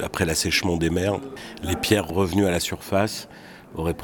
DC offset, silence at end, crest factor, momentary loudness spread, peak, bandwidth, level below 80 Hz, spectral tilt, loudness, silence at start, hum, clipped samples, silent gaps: under 0.1%; 0 s; 20 dB; 14 LU; -4 dBFS; 19 kHz; -42 dBFS; -4.5 dB/octave; -23 LUFS; 0 s; none; under 0.1%; none